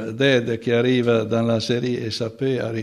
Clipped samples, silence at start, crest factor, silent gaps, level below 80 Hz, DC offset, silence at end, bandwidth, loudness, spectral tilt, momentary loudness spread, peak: under 0.1%; 0 s; 16 dB; none; -62 dBFS; under 0.1%; 0 s; 12 kHz; -21 LUFS; -6 dB/octave; 6 LU; -4 dBFS